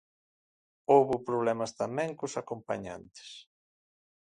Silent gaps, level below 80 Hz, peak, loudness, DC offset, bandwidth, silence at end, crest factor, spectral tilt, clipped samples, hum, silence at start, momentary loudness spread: none; -70 dBFS; -10 dBFS; -30 LUFS; under 0.1%; 10.5 kHz; 0.95 s; 22 dB; -5.5 dB/octave; under 0.1%; none; 0.9 s; 22 LU